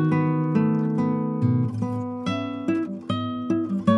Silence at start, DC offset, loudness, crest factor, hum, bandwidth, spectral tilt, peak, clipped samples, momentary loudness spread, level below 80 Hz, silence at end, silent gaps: 0 s; under 0.1%; -25 LUFS; 16 dB; none; 9.4 kHz; -8.5 dB/octave; -6 dBFS; under 0.1%; 6 LU; -66 dBFS; 0 s; none